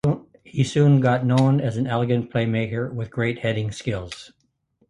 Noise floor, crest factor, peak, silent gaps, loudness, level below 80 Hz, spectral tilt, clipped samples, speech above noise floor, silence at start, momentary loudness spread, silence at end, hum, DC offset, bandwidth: -66 dBFS; 18 dB; -4 dBFS; none; -22 LUFS; -52 dBFS; -7.5 dB/octave; under 0.1%; 45 dB; 0.05 s; 13 LU; 0.6 s; none; under 0.1%; 10.5 kHz